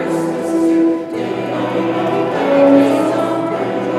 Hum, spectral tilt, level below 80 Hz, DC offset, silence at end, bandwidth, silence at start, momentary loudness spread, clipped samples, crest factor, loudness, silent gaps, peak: none; -6.5 dB/octave; -62 dBFS; under 0.1%; 0 s; 13 kHz; 0 s; 9 LU; under 0.1%; 14 dB; -15 LUFS; none; 0 dBFS